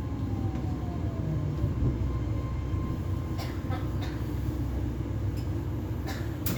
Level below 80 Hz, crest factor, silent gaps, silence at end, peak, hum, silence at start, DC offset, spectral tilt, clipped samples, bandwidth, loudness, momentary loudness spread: -36 dBFS; 16 dB; none; 0 s; -14 dBFS; none; 0 s; under 0.1%; -7.5 dB/octave; under 0.1%; over 20 kHz; -32 LUFS; 4 LU